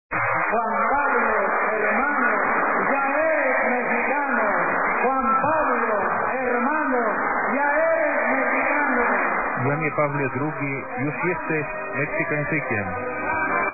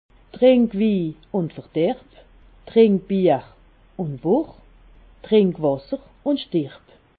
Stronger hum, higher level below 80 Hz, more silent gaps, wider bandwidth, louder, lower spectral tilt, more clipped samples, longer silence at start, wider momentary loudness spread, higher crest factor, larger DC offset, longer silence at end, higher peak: neither; about the same, -52 dBFS vs -52 dBFS; neither; second, 2.7 kHz vs 4.8 kHz; about the same, -22 LUFS vs -21 LUFS; first, -13.5 dB/octave vs -12 dB/octave; neither; second, 0.1 s vs 0.35 s; second, 5 LU vs 14 LU; about the same, 14 dB vs 18 dB; first, 0.9% vs under 0.1%; second, 0 s vs 0.5 s; second, -8 dBFS vs -4 dBFS